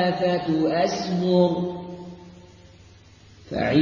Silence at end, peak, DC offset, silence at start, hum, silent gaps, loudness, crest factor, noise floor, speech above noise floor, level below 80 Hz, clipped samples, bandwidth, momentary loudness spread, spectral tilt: 0 s; -6 dBFS; under 0.1%; 0 s; none; none; -23 LUFS; 18 dB; -50 dBFS; 28 dB; -52 dBFS; under 0.1%; 7.2 kHz; 19 LU; -6.5 dB/octave